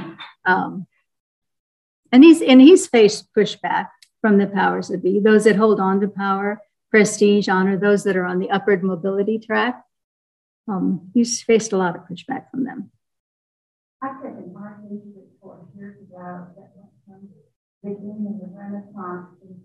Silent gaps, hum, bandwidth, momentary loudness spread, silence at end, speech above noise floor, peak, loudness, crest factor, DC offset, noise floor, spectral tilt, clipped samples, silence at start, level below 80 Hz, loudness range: 1.20-1.42 s, 1.60-2.03 s, 10.04-10.64 s, 13.20-14.00 s, 17.56-17.81 s; none; 12 kHz; 25 LU; 0.1 s; 33 dB; 0 dBFS; -17 LUFS; 18 dB; under 0.1%; -51 dBFS; -5.5 dB/octave; under 0.1%; 0 s; -70 dBFS; 23 LU